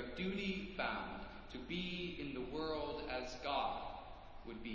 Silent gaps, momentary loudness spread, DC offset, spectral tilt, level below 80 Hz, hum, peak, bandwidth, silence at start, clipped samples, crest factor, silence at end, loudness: none; 11 LU; under 0.1%; -5.5 dB/octave; -58 dBFS; none; -24 dBFS; 7.6 kHz; 0 s; under 0.1%; 18 dB; 0 s; -43 LUFS